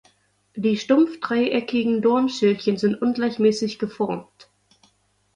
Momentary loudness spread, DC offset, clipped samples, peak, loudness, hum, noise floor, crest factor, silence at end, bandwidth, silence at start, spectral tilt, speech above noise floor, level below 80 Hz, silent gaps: 8 LU; under 0.1%; under 0.1%; -4 dBFS; -22 LUFS; none; -64 dBFS; 18 dB; 1.15 s; 10.5 kHz; 0.55 s; -6 dB/octave; 43 dB; -66 dBFS; none